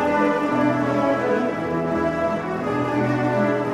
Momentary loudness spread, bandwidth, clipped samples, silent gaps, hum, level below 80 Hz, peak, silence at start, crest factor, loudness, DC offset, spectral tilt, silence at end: 4 LU; 11.5 kHz; under 0.1%; none; none; -52 dBFS; -8 dBFS; 0 s; 14 dB; -21 LUFS; under 0.1%; -7.5 dB/octave; 0 s